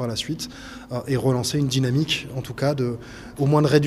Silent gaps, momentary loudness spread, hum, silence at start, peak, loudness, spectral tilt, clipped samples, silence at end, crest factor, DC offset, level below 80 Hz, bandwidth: none; 12 LU; none; 0 s; -4 dBFS; -23 LUFS; -5.5 dB/octave; under 0.1%; 0 s; 20 dB; under 0.1%; -50 dBFS; 15 kHz